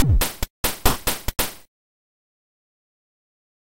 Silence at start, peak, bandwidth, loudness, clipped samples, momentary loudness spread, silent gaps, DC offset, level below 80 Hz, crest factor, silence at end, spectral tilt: 0 s; -2 dBFS; 17 kHz; -24 LUFS; under 0.1%; 5 LU; 0.50-0.64 s; under 0.1%; -30 dBFS; 24 dB; 2.15 s; -3.5 dB/octave